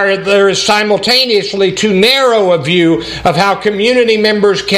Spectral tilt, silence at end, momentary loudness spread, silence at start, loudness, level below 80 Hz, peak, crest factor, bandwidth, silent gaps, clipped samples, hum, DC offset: -4 dB/octave; 0 s; 4 LU; 0 s; -10 LUFS; -44 dBFS; 0 dBFS; 10 dB; 15.5 kHz; none; under 0.1%; none; under 0.1%